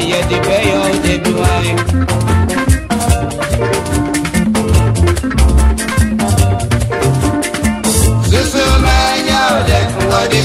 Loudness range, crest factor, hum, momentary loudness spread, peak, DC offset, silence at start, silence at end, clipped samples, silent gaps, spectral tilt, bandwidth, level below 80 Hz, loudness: 2 LU; 12 dB; none; 4 LU; 0 dBFS; under 0.1%; 0 s; 0 s; under 0.1%; none; -5 dB/octave; 16 kHz; -18 dBFS; -13 LUFS